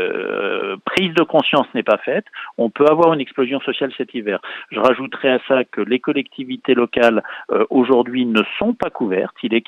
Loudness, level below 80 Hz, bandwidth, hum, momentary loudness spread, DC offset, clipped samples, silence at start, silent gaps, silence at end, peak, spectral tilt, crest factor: -18 LUFS; -60 dBFS; 10.5 kHz; none; 8 LU; under 0.1%; under 0.1%; 0 s; none; 0.05 s; -2 dBFS; -6.5 dB/octave; 16 dB